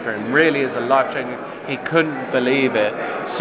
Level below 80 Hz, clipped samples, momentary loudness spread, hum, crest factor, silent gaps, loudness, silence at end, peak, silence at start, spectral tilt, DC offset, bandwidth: -64 dBFS; under 0.1%; 10 LU; none; 18 dB; none; -19 LUFS; 0 s; -2 dBFS; 0 s; -9 dB/octave; under 0.1%; 4 kHz